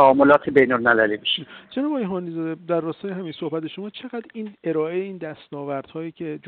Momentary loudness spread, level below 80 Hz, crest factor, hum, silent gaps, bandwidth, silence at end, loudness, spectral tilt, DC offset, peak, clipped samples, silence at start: 18 LU; -64 dBFS; 18 dB; none; none; 4.6 kHz; 0 s; -22 LUFS; -8 dB/octave; under 0.1%; -4 dBFS; under 0.1%; 0 s